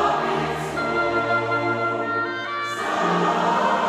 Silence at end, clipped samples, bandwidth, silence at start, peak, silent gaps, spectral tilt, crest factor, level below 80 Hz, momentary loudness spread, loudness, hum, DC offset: 0 s; under 0.1%; 14.5 kHz; 0 s; -8 dBFS; none; -5 dB/octave; 14 dB; -54 dBFS; 5 LU; -22 LUFS; none; under 0.1%